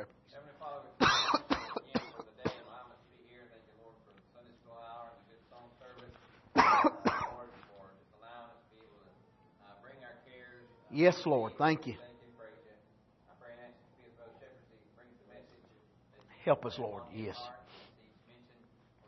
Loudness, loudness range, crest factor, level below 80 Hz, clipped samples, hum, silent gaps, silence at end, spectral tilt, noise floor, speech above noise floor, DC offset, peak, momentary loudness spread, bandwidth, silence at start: -32 LUFS; 22 LU; 28 dB; -68 dBFS; under 0.1%; none; none; 1.3 s; -3 dB/octave; -67 dBFS; 34 dB; under 0.1%; -10 dBFS; 28 LU; 6 kHz; 0 s